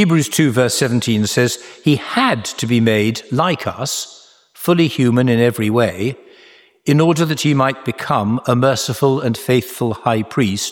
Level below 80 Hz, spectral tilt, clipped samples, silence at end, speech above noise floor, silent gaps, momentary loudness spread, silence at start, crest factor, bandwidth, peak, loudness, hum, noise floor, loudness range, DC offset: -54 dBFS; -5 dB/octave; under 0.1%; 0 s; 31 dB; none; 8 LU; 0 s; 16 dB; 19 kHz; -2 dBFS; -16 LUFS; none; -47 dBFS; 2 LU; under 0.1%